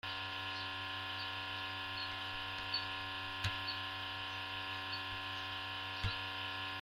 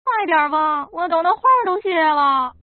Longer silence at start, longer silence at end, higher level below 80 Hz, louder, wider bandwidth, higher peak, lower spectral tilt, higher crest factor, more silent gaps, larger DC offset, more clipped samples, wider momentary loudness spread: about the same, 0.05 s vs 0.05 s; second, 0 s vs 0.15 s; about the same, -62 dBFS vs -60 dBFS; second, -40 LUFS vs -17 LUFS; first, 16 kHz vs 4.5 kHz; second, -20 dBFS vs -4 dBFS; first, -3.5 dB/octave vs 0.5 dB/octave; first, 22 dB vs 14 dB; neither; neither; neither; about the same, 3 LU vs 5 LU